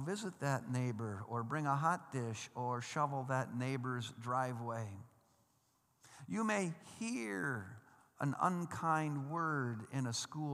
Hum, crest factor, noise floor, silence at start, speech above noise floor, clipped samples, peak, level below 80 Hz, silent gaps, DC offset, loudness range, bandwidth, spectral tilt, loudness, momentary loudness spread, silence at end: none; 20 dB; -76 dBFS; 0 s; 38 dB; under 0.1%; -20 dBFS; -84 dBFS; none; under 0.1%; 4 LU; 14 kHz; -5.5 dB/octave; -39 LUFS; 8 LU; 0 s